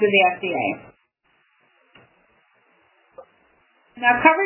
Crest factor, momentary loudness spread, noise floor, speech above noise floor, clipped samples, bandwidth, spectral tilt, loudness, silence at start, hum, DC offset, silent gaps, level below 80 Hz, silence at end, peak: 22 dB; 11 LU; -65 dBFS; 47 dB; under 0.1%; 3.2 kHz; -8 dB/octave; -19 LUFS; 0 s; none; under 0.1%; none; -64 dBFS; 0 s; -2 dBFS